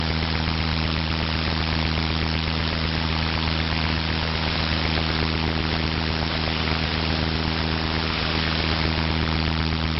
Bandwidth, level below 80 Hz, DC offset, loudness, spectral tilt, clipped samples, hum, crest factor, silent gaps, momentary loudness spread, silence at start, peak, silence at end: 6 kHz; -30 dBFS; under 0.1%; -23 LUFS; -3.5 dB/octave; under 0.1%; none; 18 dB; none; 1 LU; 0 s; -6 dBFS; 0 s